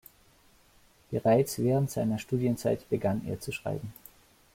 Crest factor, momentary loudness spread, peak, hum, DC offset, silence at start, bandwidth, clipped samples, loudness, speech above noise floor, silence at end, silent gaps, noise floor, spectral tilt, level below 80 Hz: 20 dB; 11 LU; -12 dBFS; none; under 0.1%; 1.1 s; 16.5 kHz; under 0.1%; -30 LUFS; 33 dB; 0.6 s; none; -62 dBFS; -7 dB/octave; -60 dBFS